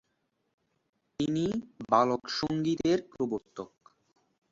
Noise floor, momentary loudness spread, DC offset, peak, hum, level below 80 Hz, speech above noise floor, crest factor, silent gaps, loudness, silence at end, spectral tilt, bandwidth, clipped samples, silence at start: -78 dBFS; 19 LU; under 0.1%; -8 dBFS; none; -64 dBFS; 49 dB; 24 dB; none; -30 LUFS; 0.85 s; -6 dB/octave; 7.8 kHz; under 0.1%; 1.2 s